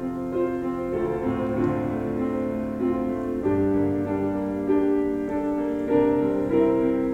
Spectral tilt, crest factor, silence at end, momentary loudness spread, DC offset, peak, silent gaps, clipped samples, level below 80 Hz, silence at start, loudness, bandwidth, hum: -9 dB/octave; 16 dB; 0 s; 6 LU; under 0.1%; -8 dBFS; none; under 0.1%; -46 dBFS; 0 s; -25 LUFS; 8.2 kHz; none